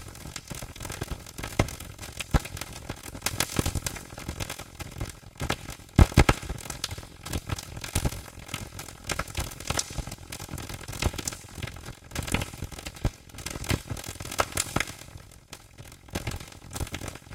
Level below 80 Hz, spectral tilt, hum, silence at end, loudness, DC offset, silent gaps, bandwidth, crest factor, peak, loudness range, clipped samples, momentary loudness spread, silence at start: -36 dBFS; -4 dB/octave; none; 0 s; -32 LUFS; under 0.1%; none; 17 kHz; 30 dB; -2 dBFS; 6 LU; under 0.1%; 12 LU; 0 s